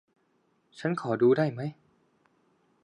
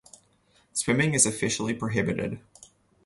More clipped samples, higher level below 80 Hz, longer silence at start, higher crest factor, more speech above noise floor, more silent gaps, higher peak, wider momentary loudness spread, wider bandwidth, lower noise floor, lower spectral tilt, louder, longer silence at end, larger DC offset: neither; second, -76 dBFS vs -56 dBFS; about the same, 0.75 s vs 0.75 s; about the same, 18 dB vs 22 dB; first, 44 dB vs 38 dB; neither; second, -12 dBFS vs -6 dBFS; about the same, 14 LU vs 12 LU; second, 9.4 kHz vs 12 kHz; first, -71 dBFS vs -64 dBFS; first, -8 dB/octave vs -3.5 dB/octave; second, -28 LUFS vs -25 LUFS; first, 1.1 s vs 0.65 s; neither